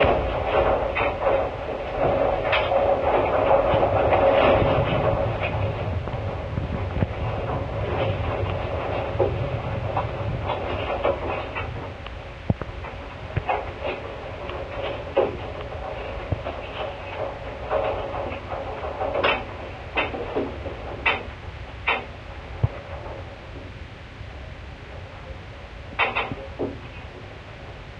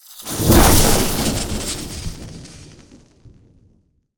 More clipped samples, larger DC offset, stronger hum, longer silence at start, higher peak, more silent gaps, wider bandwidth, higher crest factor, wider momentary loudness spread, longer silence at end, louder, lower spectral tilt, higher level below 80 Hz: neither; neither; neither; about the same, 0 s vs 0.1 s; second, -6 dBFS vs 0 dBFS; neither; second, 7.8 kHz vs over 20 kHz; about the same, 20 dB vs 18 dB; second, 18 LU vs 24 LU; second, 0 s vs 1.55 s; second, -25 LUFS vs -16 LUFS; first, -7.5 dB/octave vs -4 dB/octave; second, -38 dBFS vs -26 dBFS